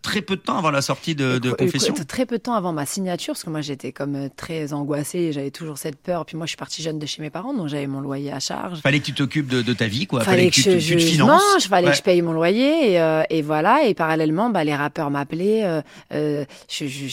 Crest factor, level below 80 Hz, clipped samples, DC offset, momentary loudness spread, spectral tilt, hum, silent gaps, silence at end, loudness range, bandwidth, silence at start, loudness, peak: 18 dB; -60 dBFS; under 0.1%; under 0.1%; 13 LU; -4.5 dB/octave; none; none; 0 s; 10 LU; 16.5 kHz; 0.05 s; -21 LUFS; -2 dBFS